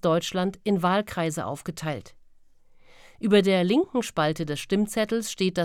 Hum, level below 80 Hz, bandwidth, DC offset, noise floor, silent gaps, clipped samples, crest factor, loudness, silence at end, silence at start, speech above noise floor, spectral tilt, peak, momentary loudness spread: none; -58 dBFS; 16.5 kHz; under 0.1%; -53 dBFS; none; under 0.1%; 18 dB; -25 LUFS; 0 s; 0.05 s; 29 dB; -5.5 dB/octave; -8 dBFS; 11 LU